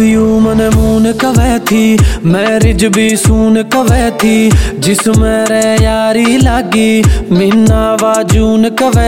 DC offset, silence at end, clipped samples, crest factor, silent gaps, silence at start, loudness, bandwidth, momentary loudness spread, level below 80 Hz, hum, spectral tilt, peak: under 0.1%; 0 s; under 0.1%; 8 dB; none; 0 s; -9 LUFS; 16.5 kHz; 2 LU; -18 dBFS; none; -5.5 dB/octave; 0 dBFS